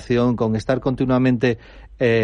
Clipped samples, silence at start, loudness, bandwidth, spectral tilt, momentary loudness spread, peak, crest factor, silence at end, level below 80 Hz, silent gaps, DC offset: under 0.1%; 0 s; -20 LUFS; 9.4 kHz; -8 dB/octave; 5 LU; -4 dBFS; 14 dB; 0 s; -42 dBFS; none; under 0.1%